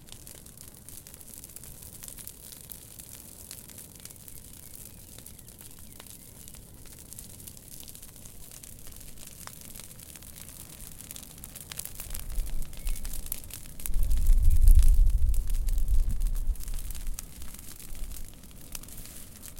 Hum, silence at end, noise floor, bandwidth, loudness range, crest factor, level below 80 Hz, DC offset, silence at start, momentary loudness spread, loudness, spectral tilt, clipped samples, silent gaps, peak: none; 0 s; -48 dBFS; 17 kHz; 16 LU; 22 dB; -30 dBFS; under 0.1%; 0.25 s; 17 LU; -36 LUFS; -4 dB/octave; under 0.1%; none; -6 dBFS